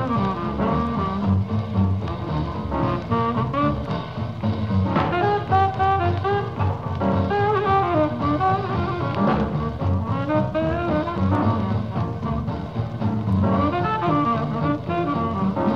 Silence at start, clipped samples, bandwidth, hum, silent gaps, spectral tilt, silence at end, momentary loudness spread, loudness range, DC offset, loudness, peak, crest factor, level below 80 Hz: 0 s; under 0.1%; 6.6 kHz; none; none; -9 dB/octave; 0 s; 6 LU; 2 LU; 0.4%; -22 LUFS; -8 dBFS; 14 dB; -42 dBFS